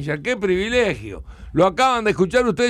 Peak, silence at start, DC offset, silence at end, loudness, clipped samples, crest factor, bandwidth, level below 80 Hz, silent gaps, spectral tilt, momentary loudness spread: -6 dBFS; 0 s; under 0.1%; 0 s; -19 LUFS; under 0.1%; 14 dB; 14 kHz; -42 dBFS; none; -5 dB/octave; 13 LU